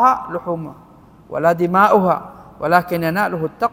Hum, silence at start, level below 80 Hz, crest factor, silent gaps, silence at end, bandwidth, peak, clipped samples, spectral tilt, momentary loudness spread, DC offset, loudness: none; 0 s; -52 dBFS; 18 dB; none; 0.05 s; 16.5 kHz; 0 dBFS; under 0.1%; -7 dB/octave; 14 LU; under 0.1%; -17 LUFS